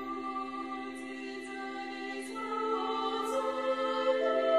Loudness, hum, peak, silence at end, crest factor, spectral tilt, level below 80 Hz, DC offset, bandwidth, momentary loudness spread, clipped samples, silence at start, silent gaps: -34 LUFS; none; -18 dBFS; 0 s; 16 dB; -3 dB/octave; -74 dBFS; under 0.1%; 13 kHz; 11 LU; under 0.1%; 0 s; none